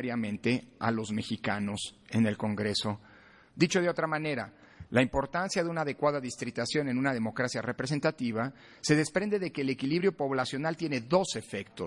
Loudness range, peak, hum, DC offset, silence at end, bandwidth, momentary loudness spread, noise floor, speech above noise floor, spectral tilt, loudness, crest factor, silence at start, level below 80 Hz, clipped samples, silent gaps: 2 LU; -10 dBFS; none; under 0.1%; 0 s; 11.5 kHz; 7 LU; -55 dBFS; 25 dB; -5 dB/octave; -31 LUFS; 20 dB; 0 s; -60 dBFS; under 0.1%; none